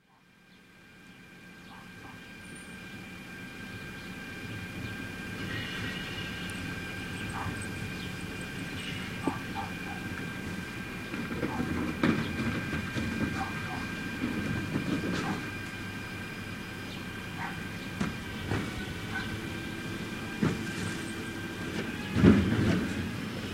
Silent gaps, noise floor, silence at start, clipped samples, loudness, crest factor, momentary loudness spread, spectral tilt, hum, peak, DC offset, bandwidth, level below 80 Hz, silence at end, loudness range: none; -61 dBFS; 0.45 s; under 0.1%; -34 LUFS; 28 dB; 13 LU; -5.5 dB/octave; none; -6 dBFS; under 0.1%; 16 kHz; -50 dBFS; 0 s; 11 LU